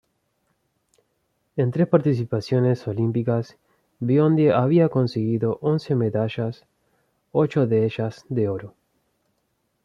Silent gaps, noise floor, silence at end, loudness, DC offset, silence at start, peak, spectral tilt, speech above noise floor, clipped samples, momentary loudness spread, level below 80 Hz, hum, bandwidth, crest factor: none; -72 dBFS; 1.15 s; -22 LUFS; under 0.1%; 1.55 s; -4 dBFS; -9.5 dB/octave; 51 dB; under 0.1%; 11 LU; -64 dBFS; none; 7.2 kHz; 18 dB